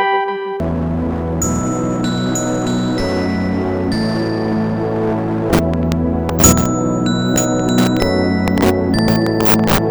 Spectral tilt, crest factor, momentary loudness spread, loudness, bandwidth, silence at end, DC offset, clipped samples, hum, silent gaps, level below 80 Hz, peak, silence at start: -5 dB/octave; 16 dB; 6 LU; -16 LUFS; over 20 kHz; 0 s; under 0.1%; under 0.1%; none; none; -32 dBFS; 0 dBFS; 0 s